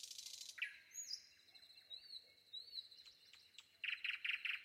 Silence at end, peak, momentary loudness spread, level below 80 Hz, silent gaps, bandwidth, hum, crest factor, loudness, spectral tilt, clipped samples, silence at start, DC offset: 0 s; -30 dBFS; 20 LU; under -90 dBFS; none; 16 kHz; none; 22 dB; -47 LUFS; 4 dB/octave; under 0.1%; 0 s; under 0.1%